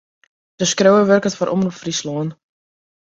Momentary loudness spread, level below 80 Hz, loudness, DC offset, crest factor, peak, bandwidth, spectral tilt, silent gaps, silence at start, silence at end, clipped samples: 12 LU; -60 dBFS; -17 LUFS; under 0.1%; 16 dB; -2 dBFS; 7.8 kHz; -4.5 dB/octave; none; 0.6 s; 0.8 s; under 0.1%